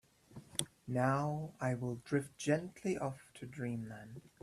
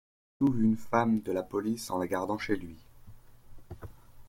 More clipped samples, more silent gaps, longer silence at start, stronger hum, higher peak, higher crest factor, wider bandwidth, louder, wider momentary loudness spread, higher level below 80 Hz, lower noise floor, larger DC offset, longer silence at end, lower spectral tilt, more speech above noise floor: neither; neither; about the same, 0.3 s vs 0.4 s; neither; about the same, -14 dBFS vs -12 dBFS; first, 26 dB vs 20 dB; second, 14.5 kHz vs 16.5 kHz; second, -38 LUFS vs -30 LUFS; second, 16 LU vs 21 LU; second, -70 dBFS vs -56 dBFS; first, -58 dBFS vs -50 dBFS; neither; first, 0.2 s vs 0 s; about the same, -5.5 dB/octave vs -6.5 dB/octave; about the same, 19 dB vs 21 dB